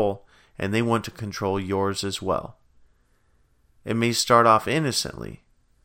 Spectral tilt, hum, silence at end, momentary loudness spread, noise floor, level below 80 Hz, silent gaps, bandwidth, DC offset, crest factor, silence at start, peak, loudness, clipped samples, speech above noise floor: -4.5 dB/octave; none; 0.5 s; 20 LU; -63 dBFS; -54 dBFS; none; 16.5 kHz; under 0.1%; 22 dB; 0 s; -2 dBFS; -23 LUFS; under 0.1%; 39 dB